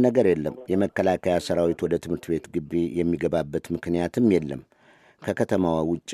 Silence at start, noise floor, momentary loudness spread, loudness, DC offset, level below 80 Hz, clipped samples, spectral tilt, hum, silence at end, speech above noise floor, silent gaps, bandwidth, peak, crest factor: 0 s; -57 dBFS; 8 LU; -25 LUFS; under 0.1%; -52 dBFS; under 0.1%; -7 dB/octave; none; 0 s; 33 dB; none; 14 kHz; -6 dBFS; 18 dB